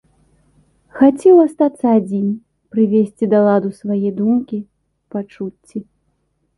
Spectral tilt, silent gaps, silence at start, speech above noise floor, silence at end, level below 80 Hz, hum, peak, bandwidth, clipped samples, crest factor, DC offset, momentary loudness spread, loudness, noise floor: -9 dB/octave; none; 0.95 s; 51 dB; 0.75 s; -60 dBFS; none; -2 dBFS; 11.5 kHz; under 0.1%; 16 dB; under 0.1%; 18 LU; -15 LUFS; -66 dBFS